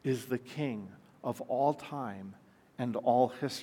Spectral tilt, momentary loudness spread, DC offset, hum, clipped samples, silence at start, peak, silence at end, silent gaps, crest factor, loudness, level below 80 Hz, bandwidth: -6.5 dB/octave; 18 LU; under 0.1%; none; under 0.1%; 0.05 s; -14 dBFS; 0 s; none; 20 dB; -34 LUFS; -80 dBFS; 17 kHz